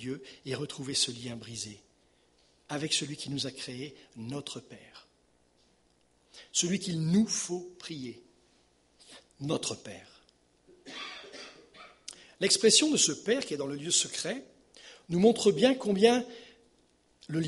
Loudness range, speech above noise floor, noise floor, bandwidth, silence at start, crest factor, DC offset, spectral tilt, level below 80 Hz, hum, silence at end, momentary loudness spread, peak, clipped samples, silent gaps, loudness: 13 LU; 39 dB; -69 dBFS; 11.5 kHz; 0 s; 24 dB; under 0.1%; -3 dB/octave; -70 dBFS; 60 Hz at -65 dBFS; 0 s; 22 LU; -8 dBFS; under 0.1%; none; -29 LUFS